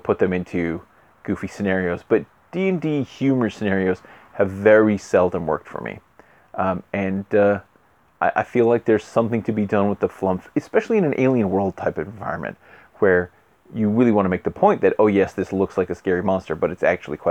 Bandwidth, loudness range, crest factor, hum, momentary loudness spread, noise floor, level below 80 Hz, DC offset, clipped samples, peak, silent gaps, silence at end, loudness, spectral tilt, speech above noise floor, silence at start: 9 kHz; 3 LU; 20 dB; none; 11 LU; -58 dBFS; -54 dBFS; under 0.1%; under 0.1%; -2 dBFS; none; 0 s; -21 LUFS; -8 dB/octave; 38 dB; 0.05 s